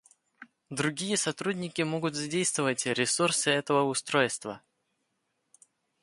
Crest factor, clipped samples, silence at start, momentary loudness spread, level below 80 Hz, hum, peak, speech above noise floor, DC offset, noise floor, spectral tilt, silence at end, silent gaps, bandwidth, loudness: 20 dB; under 0.1%; 0.4 s; 7 LU; -74 dBFS; none; -10 dBFS; 50 dB; under 0.1%; -78 dBFS; -3 dB/octave; 1.45 s; none; 11.5 kHz; -28 LUFS